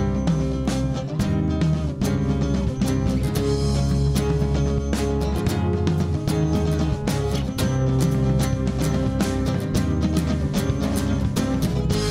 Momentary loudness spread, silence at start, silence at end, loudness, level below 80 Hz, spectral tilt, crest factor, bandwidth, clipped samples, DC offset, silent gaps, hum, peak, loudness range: 3 LU; 0 s; 0 s; -23 LUFS; -30 dBFS; -6.5 dB/octave; 12 dB; 16 kHz; under 0.1%; under 0.1%; none; none; -10 dBFS; 1 LU